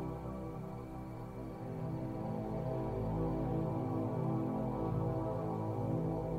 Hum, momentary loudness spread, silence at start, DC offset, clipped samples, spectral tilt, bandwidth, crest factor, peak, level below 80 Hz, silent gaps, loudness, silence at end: none; 9 LU; 0 s; under 0.1%; under 0.1%; -10 dB/octave; 15.5 kHz; 12 dB; -24 dBFS; -52 dBFS; none; -39 LUFS; 0 s